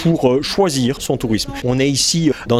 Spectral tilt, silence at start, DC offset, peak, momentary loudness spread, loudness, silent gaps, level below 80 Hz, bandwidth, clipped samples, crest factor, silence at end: -4.5 dB/octave; 0 s; under 0.1%; 0 dBFS; 5 LU; -16 LUFS; none; -40 dBFS; 16 kHz; under 0.1%; 16 dB; 0 s